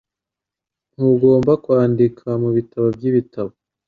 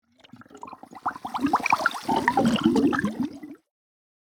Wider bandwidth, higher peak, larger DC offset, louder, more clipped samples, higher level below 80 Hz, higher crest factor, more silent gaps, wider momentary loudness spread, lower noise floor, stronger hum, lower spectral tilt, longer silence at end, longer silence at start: second, 4.9 kHz vs 19.5 kHz; about the same, -2 dBFS vs -4 dBFS; neither; first, -17 LUFS vs -24 LUFS; neither; about the same, -54 dBFS vs -58 dBFS; second, 16 dB vs 22 dB; neither; second, 10 LU vs 22 LU; first, -86 dBFS vs -51 dBFS; neither; first, -11 dB/octave vs -5 dB/octave; second, 0.4 s vs 0.65 s; first, 1 s vs 0.4 s